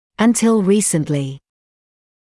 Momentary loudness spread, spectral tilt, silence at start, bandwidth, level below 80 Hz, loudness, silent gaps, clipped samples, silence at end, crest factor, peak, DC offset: 9 LU; -5 dB/octave; 0.2 s; 12 kHz; -56 dBFS; -16 LUFS; none; under 0.1%; 0.9 s; 14 dB; -4 dBFS; under 0.1%